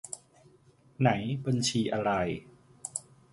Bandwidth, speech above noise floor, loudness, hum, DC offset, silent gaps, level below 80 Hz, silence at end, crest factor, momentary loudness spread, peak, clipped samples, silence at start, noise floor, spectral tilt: 11.5 kHz; 33 dB; -30 LUFS; none; under 0.1%; none; -60 dBFS; 0.3 s; 22 dB; 15 LU; -10 dBFS; under 0.1%; 0.05 s; -61 dBFS; -5 dB/octave